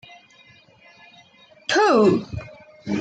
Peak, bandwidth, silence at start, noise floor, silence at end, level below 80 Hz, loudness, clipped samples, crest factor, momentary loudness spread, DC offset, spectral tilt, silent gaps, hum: -6 dBFS; 9.2 kHz; 1.7 s; -52 dBFS; 0 s; -54 dBFS; -19 LUFS; under 0.1%; 18 dB; 22 LU; under 0.1%; -5 dB/octave; none; none